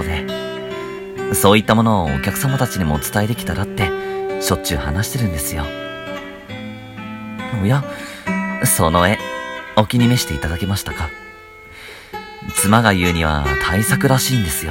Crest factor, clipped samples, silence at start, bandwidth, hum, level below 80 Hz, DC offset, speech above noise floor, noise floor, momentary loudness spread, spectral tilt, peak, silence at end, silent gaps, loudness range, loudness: 18 dB; under 0.1%; 0 s; 17 kHz; none; -34 dBFS; under 0.1%; 22 dB; -39 dBFS; 17 LU; -4.5 dB/octave; 0 dBFS; 0 s; none; 6 LU; -18 LUFS